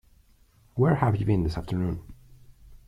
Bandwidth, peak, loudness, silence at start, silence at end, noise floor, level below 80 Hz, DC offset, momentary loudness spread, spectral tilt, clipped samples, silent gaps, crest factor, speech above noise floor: 11.5 kHz; -8 dBFS; -26 LUFS; 0.75 s; 0.1 s; -59 dBFS; -44 dBFS; under 0.1%; 12 LU; -9 dB/octave; under 0.1%; none; 18 dB; 35 dB